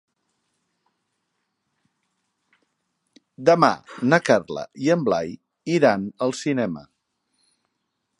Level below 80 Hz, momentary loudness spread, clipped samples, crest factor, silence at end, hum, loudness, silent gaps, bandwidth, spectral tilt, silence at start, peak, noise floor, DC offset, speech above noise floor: -66 dBFS; 13 LU; under 0.1%; 24 dB; 1.4 s; none; -21 LUFS; none; 11.5 kHz; -6 dB/octave; 3.4 s; -2 dBFS; -77 dBFS; under 0.1%; 56 dB